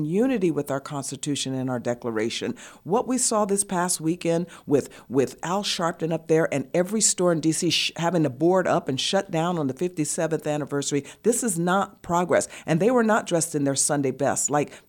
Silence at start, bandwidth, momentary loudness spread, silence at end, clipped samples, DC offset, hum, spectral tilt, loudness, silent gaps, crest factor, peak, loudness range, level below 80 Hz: 0 s; 17.5 kHz; 6 LU; 0.1 s; under 0.1%; under 0.1%; none; -4 dB/octave; -24 LUFS; none; 16 dB; -8 dBFS; 3 LU; -62 dBFS